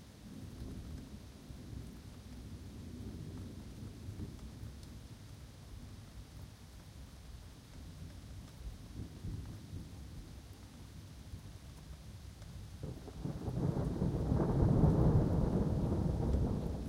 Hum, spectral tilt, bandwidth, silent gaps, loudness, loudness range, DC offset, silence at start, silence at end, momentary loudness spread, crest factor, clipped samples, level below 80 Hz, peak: none; -8.5 dB/octave; 16 kHz; none; -38 LUFS; 19 LU; under 0.1%; 0 s; 0 s; 21 LU; 22 dB; under 0.1%; -46 dBFS; -16 dBFS